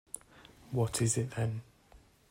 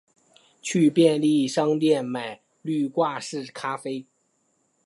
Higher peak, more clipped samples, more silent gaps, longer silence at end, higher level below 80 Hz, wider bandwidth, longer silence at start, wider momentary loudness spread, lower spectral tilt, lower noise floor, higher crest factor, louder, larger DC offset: second, -16 dBFS vs -6 dBFS; neither; neither; second, 0.35 s vs 0.85 s; first, -60 dBFS vs -76 dBFS; first, 16 kHz vs 11.5 kHz; second, 0.15 s vs 0.65 s; about the same, 15 LU vs 16 LU; about the same, -5 dB/octave vs -5.5 dB/octave; second, -61 dBFS vs -70 dBFS; about the same, 20 dB vs 18 dB; second, -34 LUFS vs -24 LUFS; neither